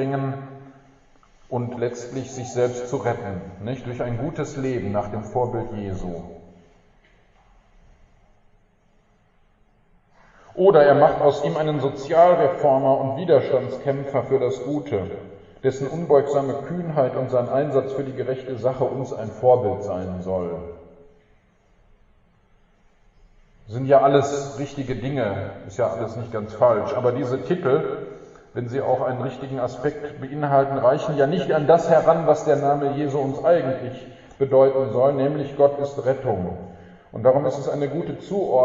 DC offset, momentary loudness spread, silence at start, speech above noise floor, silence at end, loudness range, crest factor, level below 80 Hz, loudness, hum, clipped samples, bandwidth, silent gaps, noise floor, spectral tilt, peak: under 0.1%; 14 LU; 0 s; 38 dB; 0 s; 9 LU; 20 dB; -52 dBFS; -22 LUFS; none; under 0.1%; 7.8 kHz; none; -59 dBFS; -7.5 dB/octave; -2 dBFS